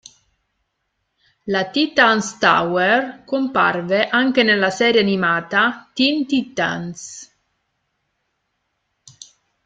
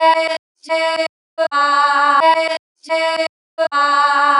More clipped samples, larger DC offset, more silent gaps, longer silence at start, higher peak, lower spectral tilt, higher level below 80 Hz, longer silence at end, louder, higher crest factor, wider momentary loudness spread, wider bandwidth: neither; neither; second, none vs 0.39-0.55 s, 1.09-1.37 s, 2.59-2.75 s, 3.29-3.57 s; first, 1.45 s vs 0 s; about the same, 0 dBFS vs -2 dBFS; first, -4 dB/octave vs 0 dB/octave; first, -62 dBFS vs under -90 dBFS; first, 2.4 s vs 0 s; about the same, -17 LUFS vs -16 LUFS; first, 20 dB vs 14 dB; about the same, 10 LU vs 10 LU; second, 9.2 kHz vs 11.5 kHz